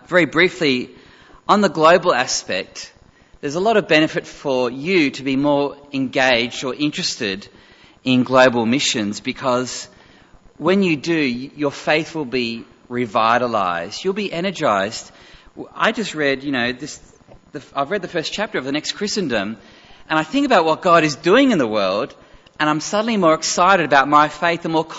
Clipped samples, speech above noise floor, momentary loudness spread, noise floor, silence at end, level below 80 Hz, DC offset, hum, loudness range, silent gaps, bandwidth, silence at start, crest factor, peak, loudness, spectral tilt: under 0.1%; 30 dB; 14 LU; -48 dBFS; 0 s; -54 dBFS; under 0.1%; none; 6 LU; none; 8 kHz; 0.1 s; 18 dB; 0 dBFS; -18 LUFS; -4 dB/octave